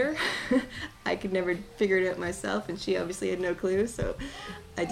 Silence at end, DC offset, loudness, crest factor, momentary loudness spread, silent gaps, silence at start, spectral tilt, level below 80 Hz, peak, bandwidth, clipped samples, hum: 0 s; under 0.1%; -30 LUFS; 18 dB; 10 LU; none; 0 s; -4.5 dB/octave; -50 dBFS; -12 dBFS; 15 kHz; under 0.1%; none